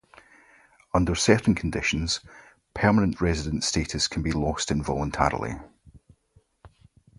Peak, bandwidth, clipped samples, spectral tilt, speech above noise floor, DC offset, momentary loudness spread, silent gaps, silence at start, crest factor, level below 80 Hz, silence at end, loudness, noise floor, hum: -2 dBFS; 11.5 kHz; under 0.1%; -4.5 dB/octave; 39 dB; under 0.1%; 8 LU; none; 0.95 s; 24 dB; -40 dBFS; 0.5 s; -25 LUFS; -63 dBFS; none